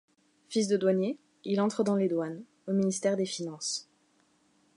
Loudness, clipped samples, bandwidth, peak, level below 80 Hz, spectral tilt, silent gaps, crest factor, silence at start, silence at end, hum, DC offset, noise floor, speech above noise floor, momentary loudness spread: -30 LUFS; under 0.1%; 11.5 kHz; -14 dBFS; -80 dBFS; -5 dB/octave; none; 16 dB; 0.5 s; 0.95 s; none; under 0.1%; -68 dBFS; 40 dB; 9 LU